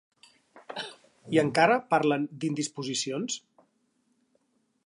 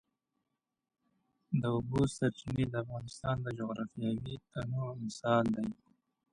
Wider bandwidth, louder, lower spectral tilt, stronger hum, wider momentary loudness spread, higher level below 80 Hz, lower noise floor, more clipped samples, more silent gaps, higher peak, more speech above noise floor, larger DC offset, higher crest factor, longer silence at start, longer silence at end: about the same, 11.5 kHz vs 11 kHz; first, -28 LUFS vs -35 LUFS; second, -4 dB/octave vs -7 dB/octave; neither; first, 16 LU vs 10 LU; second, -76 dBFS vs -60 dBFS; second, -72 dBFS vs -86 dBFS; neither; neither; first, -8 dBFS vs -16 dBFS; second, 46 dB vs 52 dB; neither; about the same, 22 dB vs 20 dB; second, 0.55 s vs 1.5 s; first, 1.45 s vs 0.6 s